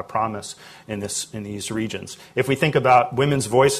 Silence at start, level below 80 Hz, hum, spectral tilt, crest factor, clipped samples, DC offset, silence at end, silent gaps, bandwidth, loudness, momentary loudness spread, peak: 0 s; -54 dBFS; none; -4.5 dB/octave; 18 dB; under 0.1%; under 0.1%; 0 s; none; 14 kHz; -21 LUFS; 16 LU; -4 dBFS